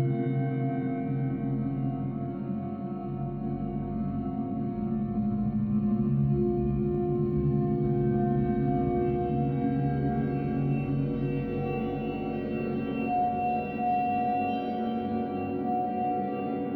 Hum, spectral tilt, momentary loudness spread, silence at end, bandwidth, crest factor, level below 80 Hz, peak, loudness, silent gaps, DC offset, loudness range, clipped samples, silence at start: none; -11.5 dB/octave; 6 LU; 0 s; 4.5 kHz; 12 dB; -46 dBFS; -16 dBFS; -29 LUFS; none; under 0.1%; 5 LU; under 0.1%; 0 s